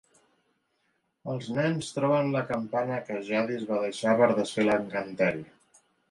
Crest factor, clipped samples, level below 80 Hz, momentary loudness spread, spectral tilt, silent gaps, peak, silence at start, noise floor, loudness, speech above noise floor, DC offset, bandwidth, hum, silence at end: 20 dB; under 0.1%; -68 dBFS; 10 LU; -6 dB/octave; none; -10 dBFS; 1.25 s; -74 dBFS; -28 LUFS; 47 dB; under 0.1%; 11.5 kHz; none; 0.65 s